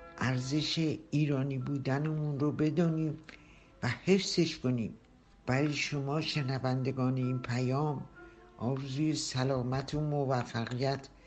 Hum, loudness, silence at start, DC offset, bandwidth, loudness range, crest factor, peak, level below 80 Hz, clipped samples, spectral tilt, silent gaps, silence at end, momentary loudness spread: none; -33 LUFS; 0 s; under 0.1%; 8.6 kHz; 2 LU; 18 dB; -14 dBFS; -60 dBFS; under 0.1%; -6 dB/octave; none; 0.2 s; 7 LU